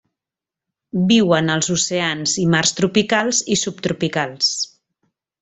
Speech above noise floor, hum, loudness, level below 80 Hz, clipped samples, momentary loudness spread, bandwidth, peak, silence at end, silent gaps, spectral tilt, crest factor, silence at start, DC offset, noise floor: 70 dB; none; -18 LUFS; -56 dBFS; under 0.1%; 7 LU; 8.4 kHz; -2 dBFS; 0.75 s; none; -3.5 dB/octave; 18 dB; 0.95 s; under 0.1%; -88 dBFS